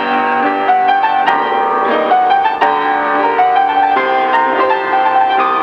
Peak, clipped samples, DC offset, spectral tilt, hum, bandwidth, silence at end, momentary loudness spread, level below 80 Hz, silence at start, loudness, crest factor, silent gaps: 0 dBFS; under 0.1%; under 0.1%; -5 dB/octave; none; 6.2 kHz; 0 s; 2 LU; -60 dBFS; 0 s; -12 LUFS; 12 dB; none